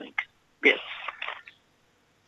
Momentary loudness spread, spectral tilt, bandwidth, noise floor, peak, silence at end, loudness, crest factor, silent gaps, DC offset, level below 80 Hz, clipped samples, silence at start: 18 LU; -2.5 dB/octave; 8 kHz; -66 dBFS; -6 dBFS; 0.75 s; -27 LUFS; 24 dB; none; under 0.1%; -74 dBFS; under 0.1%; 0 s